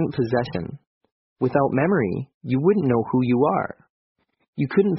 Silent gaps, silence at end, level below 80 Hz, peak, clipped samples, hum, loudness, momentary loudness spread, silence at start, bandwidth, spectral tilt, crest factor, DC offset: 0.87-1.01 s, 1.12-1.36 s, 2.34-2.41 s, 3.90-4.15 s, 4.48-4.53 s; 0 s; -56 dBFS; -6 dBFS; under 0.1%; none; -22 LUFS; 12 LU; 0 s; 5.8 kHz; -7.5 dB/octave; 16 dB; under 0.1%